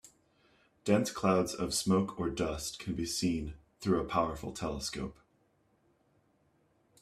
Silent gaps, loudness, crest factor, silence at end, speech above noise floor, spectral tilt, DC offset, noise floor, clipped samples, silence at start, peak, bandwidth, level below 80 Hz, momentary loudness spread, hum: none; -33 LUFS; 22 dB; 1.9 s; 39 dB; -5 dB/octave; under 0.1%; -72 dBFS; under 0.1%; 0.05 s; -14 dBFS; 15 kHz; -54 dBFS; 10 LU; none